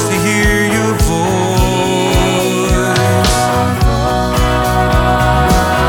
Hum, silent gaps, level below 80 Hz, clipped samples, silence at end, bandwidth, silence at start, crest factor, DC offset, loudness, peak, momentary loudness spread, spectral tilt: none; none; -20 dBFS; under 0.1%; 0 s; 19 kHz; 0 s; 12 dB; under 0.1%; -12 LUFS; 0 dBFS; 2 LU; -5 dB/octave